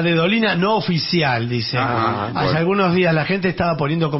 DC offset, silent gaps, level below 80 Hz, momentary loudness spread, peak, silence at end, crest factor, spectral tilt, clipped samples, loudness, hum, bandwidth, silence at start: under 0.1%; none; -48 dBFS; 4 LU; -6 dBFS; 0 s; 12 dB; -9 dB/octave; under 0.1%; -18 LUFS; none; 6 kHz; 0 s